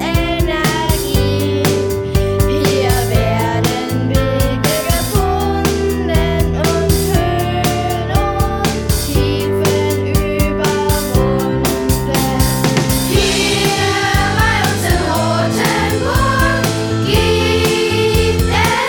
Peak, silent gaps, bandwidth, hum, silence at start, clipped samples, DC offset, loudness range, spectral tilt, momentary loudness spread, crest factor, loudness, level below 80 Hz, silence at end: 0 dBFS; none; over 20 kHz; none; 0 s; under 0.1%; under 0.1%; 2 LU; -5 dB/octave; 3 LU; 14 dB; -15 LUFS; -24 dBFS; 0 s